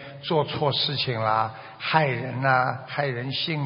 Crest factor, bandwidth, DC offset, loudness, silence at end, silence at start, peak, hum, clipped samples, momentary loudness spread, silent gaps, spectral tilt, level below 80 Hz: 22 dB; 5.6 kHz; under 0.1%; -25 LUFS; 0 s; 0 s; -4 dBFS; none; under 0.1%; 6 LU; none; -3 dB/octave; -64 dBFS